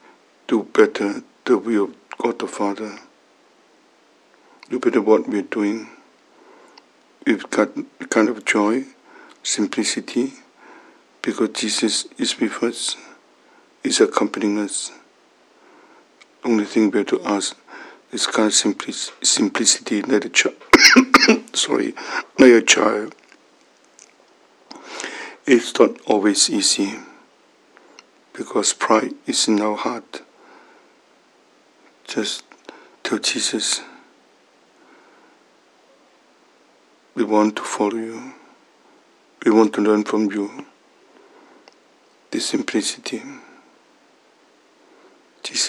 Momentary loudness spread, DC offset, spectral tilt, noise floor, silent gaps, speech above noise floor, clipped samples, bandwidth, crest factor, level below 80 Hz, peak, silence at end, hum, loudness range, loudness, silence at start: 16 LU; under 0.1%; -2 dB/octave; -55 dBFS; none; 37 dB; under 0.1%; 16.5 kHz; 22 dB; -64 dBFS; 0 dBFS; 0 s; none; 13 LU; -19 LUFS; 0.5 s